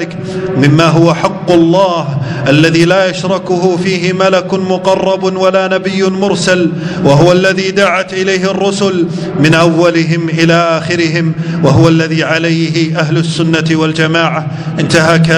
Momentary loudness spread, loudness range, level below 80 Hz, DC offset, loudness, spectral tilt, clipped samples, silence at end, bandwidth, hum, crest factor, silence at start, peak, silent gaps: 6 LU; 2 LU; -44 dBFS; under 0.1%; -10 LUFS; -6 dB/octave; 1%; 0 s; 10.5 kHz; none; 10 dB; 0 s; 0 dBFS; none